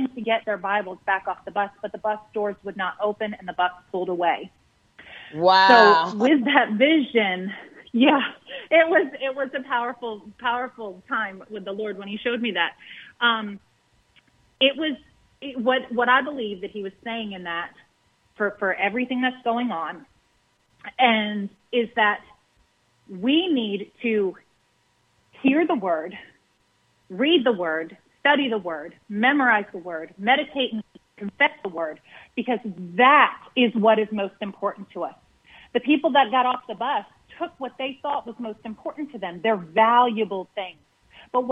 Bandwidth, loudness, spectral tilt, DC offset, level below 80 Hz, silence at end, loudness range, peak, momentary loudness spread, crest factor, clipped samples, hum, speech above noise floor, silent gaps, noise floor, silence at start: 7.8 kHz; -22 LUFS; -6 dB/octave; under 0.1%; -70 dBFS; 0 s; 8 LU; -2 dBFS; 16 LU; 22 dB; under 0.1%; none; 43 dB; none; -66 dBFS; 0 s